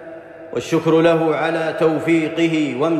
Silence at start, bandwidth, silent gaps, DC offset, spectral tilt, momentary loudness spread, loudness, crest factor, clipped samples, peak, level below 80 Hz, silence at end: 0 s; 12 kHz; none; under 0.1%; -6.5 dB/octave; 13 LU; -17 LUFS; 14 dB; under 0.1%; -4 dBFS; -62 dBFS; 0 s